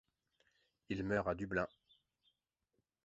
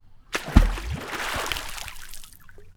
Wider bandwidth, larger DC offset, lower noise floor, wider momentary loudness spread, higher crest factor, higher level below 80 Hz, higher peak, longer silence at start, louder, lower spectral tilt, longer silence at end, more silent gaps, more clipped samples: second, 7.6 kHz vs 18.5 kHz; neither; first, -86 dBFS vs -45 dBFS; second, 8 LU vs 20 LU; about the same, 22 dB vs 26 dB; second, -64 dBFS vs -28 dBFS; second, -22 dBFS vs 0 dBFS; first, 0.9 s vs 0.05 s; second, -40 LUFS vs -27 LUFS; about the same, -5.5 dB/octave vs -4.5 dB/octave; first, 1.4 s vs 0.05 s; neither; neither